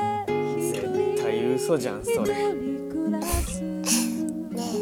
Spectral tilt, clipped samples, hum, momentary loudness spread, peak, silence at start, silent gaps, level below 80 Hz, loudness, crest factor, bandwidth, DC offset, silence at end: -4.5 dB/octave; under 0.1%; none; 7 LU; -8 dBFS; 0 s; none; -40 dBFS; -26 LUFS; 18 dB; 18 kHz; under 0.1%; 0 s